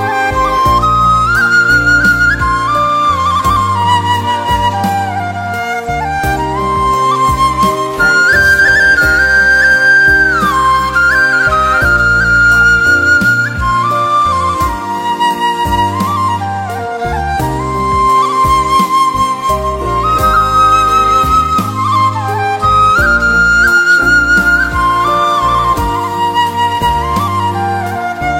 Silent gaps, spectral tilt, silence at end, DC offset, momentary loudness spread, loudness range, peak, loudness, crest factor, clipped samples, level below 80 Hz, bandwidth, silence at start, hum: none; -4 dB/octave; 0 s; under 0.1%; 9 LU; 6 LU; 0 dBFS; -10 LUFS; 10 dB; under 0.1%; -26 dBFS; 16.5 kHz; 0 s; none